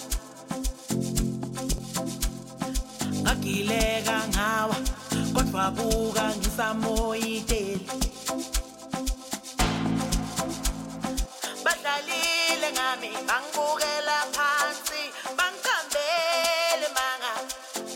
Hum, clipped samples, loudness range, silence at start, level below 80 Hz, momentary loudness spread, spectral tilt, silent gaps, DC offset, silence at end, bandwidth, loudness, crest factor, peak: none; under 0.1%; 4 LU; 0 s; -36 dBFS; 9 LU; -3 dB/octave; none; under 0.1%; 0 s; 17 kHz; -27 LUFS; 18 dB; -10 dBFS